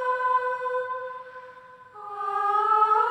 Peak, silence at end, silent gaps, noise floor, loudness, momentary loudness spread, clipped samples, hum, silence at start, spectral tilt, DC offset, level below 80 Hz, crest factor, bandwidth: -10 dBFS; 0 s; none; -47 dBFS; -25 LUFS; 22 LU; under 0.1%; none; 0 s; -3 dB/octave; under 0.1%; -80 dBFS; 16 dB; 10.5 kHz